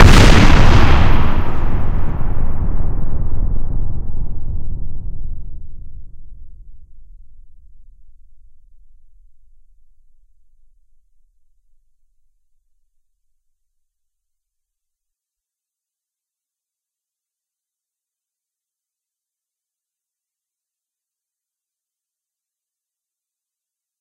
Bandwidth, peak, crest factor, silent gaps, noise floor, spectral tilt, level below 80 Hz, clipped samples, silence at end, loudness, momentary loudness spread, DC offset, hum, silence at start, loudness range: 9.4 kHz; 0 dBFS; 16 dB; none; -87 dBFS; -5.5 dB/octave; -20 dBFS; 0.2%; 16.75 s; -17 LUFS; 23 LU; under 0.1%; none; 0 s; 23 LU